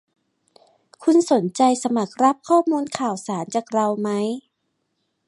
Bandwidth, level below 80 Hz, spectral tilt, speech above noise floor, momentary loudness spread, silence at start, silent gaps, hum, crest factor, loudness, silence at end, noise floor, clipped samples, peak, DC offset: 11.5 kHz; -74 dBFS; -5.5 dB/octave; 54 dB; 8 LU; 1 s; none; none; 18 dB; -21 LUFS; 0.9 s; -74 dBFS; under 0.1%; -4 dBFS; under 0.1%